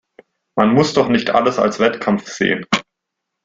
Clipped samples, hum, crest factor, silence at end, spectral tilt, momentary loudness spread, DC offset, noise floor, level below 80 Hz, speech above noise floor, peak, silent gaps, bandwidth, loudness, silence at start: under 0.1%; none; 18 dB; 0.65 s; -5 dB/octave; 6 LU; under 0.1%; -79 dBFS; -54 dBFS; 63 dB; 0 dBFS; none; 7.8 kHz; -17 LUFS; 0.55 s